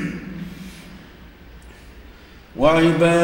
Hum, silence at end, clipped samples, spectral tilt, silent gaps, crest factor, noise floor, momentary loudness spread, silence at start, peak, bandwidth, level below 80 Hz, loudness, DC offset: none; 0 s; under 0.1%; -6 dB/octave; none; 18 dB; -44 dBFS; 25 LU; 0 s; -4 dBFS; 16 kHz; -44 dBFS; -18 LUFS; under 0.1%